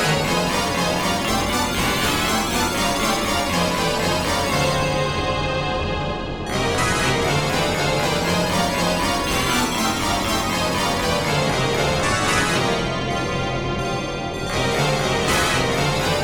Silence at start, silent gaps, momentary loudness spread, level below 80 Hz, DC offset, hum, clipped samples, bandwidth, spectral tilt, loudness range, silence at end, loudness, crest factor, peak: 0 s; none; 4 LU; -36 dBFS; under 0.1%; none; under 0.1%; over 20 kHz; -3.5 dB/octave; 2 LU; 0 s; -20 LUFS; 16 dB; -6 dBFS